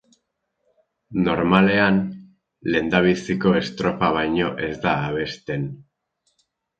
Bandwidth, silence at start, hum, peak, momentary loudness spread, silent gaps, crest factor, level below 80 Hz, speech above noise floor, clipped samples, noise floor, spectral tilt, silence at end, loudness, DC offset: 7.8 kHz; 1.1 s; none; 0 dBFS; 12 LU; none; 22 dB; -50 dBFS; 54 dB; under 0.1%; -74 dBFS; -7 dB/octave; 1 s; -21 LUFS; under 0.1%